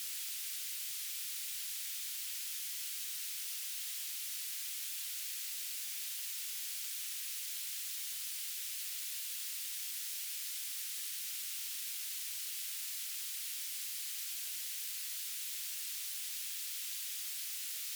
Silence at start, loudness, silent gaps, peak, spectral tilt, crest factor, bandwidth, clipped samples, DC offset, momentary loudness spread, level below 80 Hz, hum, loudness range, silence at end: 0 s; -38 LUFS; none; -28 dBFS; 10 dB/octave; 14 dB; over 20 kHz; under 0.1%; under 0.1%; 0 LU; under -90 dBFS; none; 0 LU; 0 s